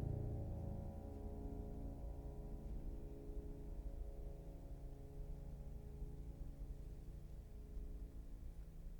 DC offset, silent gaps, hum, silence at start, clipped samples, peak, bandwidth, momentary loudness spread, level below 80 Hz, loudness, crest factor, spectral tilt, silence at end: under 0.1%; none; none; 0 s; under 0.1%; -32 dBFS; over 20 kHz; 8 LU; -50 dBFS; -53 LUFS; 16 dB; -9 dB/octave; 0 s